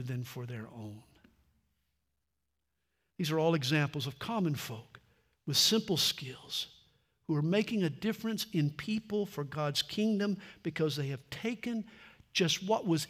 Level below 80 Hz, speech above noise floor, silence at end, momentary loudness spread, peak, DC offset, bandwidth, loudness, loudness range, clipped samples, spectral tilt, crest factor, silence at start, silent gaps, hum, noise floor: -72 dBFS; 52 dB; 0 s; 14 LU; -14 dBFS; under 0.1%; 16 kHz; -33 LUFS; 5 LU; under 0.1%; -4.5 dB/octave; 20 dB; 0 s; none; none; -85 dBFS